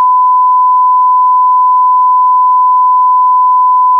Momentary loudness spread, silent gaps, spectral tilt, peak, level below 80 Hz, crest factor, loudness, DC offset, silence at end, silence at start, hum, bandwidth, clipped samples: 0 LU; none; -3.5 dB/octave; -4 dBFS; under -90 dBFS; 4 dB; -7 LUFS; under 0.1%; 0 s; 0 s; none; 1.2 kHz; under 0.1%